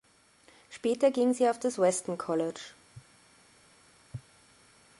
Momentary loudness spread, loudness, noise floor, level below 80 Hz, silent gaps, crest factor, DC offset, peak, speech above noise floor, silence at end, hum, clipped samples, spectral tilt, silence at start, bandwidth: 21 LU; -29 LUFS; -62 dBFS; -72 dBFS; none; 18 dB; under 0.1%; -14 dBFS; 34 dB; 0.8 s; none; under 0.1%; -4.5 dB/octave; 0.7 s; 11.5 kHz